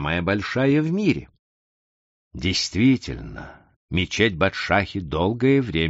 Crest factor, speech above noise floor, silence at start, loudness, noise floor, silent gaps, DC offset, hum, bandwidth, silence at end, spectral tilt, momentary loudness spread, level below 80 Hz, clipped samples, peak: 18 dB; over 68 dB; 0 s; -22 LUFS; under -90 dBFS; 1.39-2.31 s, 3.76-3.88 s; under 0.1%; none; 8 kHz; 0 s; -4.5 dB/octave; 12 LU; -44 dBFS; under 0.1%; -4 dBFS